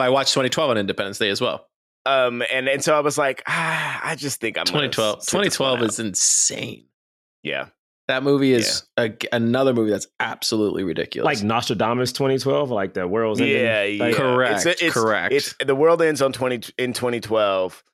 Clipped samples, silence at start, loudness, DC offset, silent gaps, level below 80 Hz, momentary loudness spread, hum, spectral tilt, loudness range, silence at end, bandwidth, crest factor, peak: under 0.1%; 0 s; -20 LUFS; under 0.1%; 1.76-2.05 s, 6.94-7.43 s, 7.79-8.08 s; -64 dBFS; 8 LU; none; -3 dB/octave; 2 LU; 0.15 s; 16 kHz; 14 dB; -6 dBFS